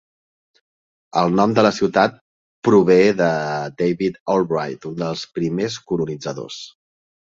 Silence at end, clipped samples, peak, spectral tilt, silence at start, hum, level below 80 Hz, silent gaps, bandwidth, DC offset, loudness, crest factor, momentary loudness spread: 0.65 s; under 0.1%; -2 dBFS; -6 dB/octave; 1.15 s; none; -58 dBFS; 2.21-2.62 s, 4.20-4.26 s; 7.8 kHz; under 0.1%; -19 LUFS; 18 dB; 14 LU